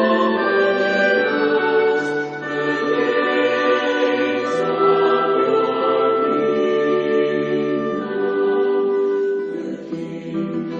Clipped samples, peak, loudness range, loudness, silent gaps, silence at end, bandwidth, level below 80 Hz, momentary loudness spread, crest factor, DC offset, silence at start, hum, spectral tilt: under 0.1%; -4 dBFS; 3 LU; -19 LUFS; none; 0 s; 7.6 kHz; -64 dBFS; 8 LU; 14 dB; under 0.1%; 0 s; none; -6 dB/octave